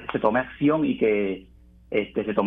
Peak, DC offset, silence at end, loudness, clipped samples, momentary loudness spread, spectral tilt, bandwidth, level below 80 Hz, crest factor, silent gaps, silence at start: -6 dBFS; under 0.1%; 0 s; -24 LUFS; under 0.1%; 7 LU; -9.5 dB/octave; 3.9 kHz; -52 dBFS; 18 dB; none; 0 s